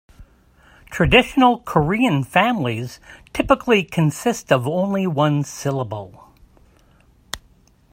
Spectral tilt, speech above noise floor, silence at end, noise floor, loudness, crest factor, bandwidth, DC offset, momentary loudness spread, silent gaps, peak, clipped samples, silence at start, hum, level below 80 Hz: -5.5 dB/octave; 36 dB; 0.55 s; -54 dBFS; -19 LUFS; 20 dB; 16 kHz; under 0.1%; 19 LU; none; 0 dBFS; under 0.1%; 0.2 s; none; -42 dBFS